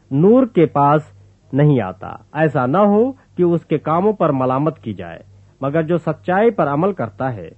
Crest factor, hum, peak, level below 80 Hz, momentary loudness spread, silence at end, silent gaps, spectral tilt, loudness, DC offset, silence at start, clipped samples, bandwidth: 14 dB; none; -2 dBFS; -56 dBFS; 13 LU; 0.1 s; none; -10 dB/octave; -17 LUFS; under 0.1%; 0.1 s; under 0.1%; 4.2 kHz